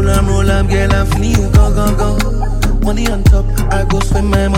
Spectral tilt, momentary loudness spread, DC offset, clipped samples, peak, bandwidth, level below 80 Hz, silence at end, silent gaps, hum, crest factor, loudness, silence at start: -6 dB/octave; 5 LU; under 0.1%; under 0.1%; 0 dBFS; 16.5 kHz; -14 dBFS; 0 s; none; none; 10 dB; -14 LUFS; 0 s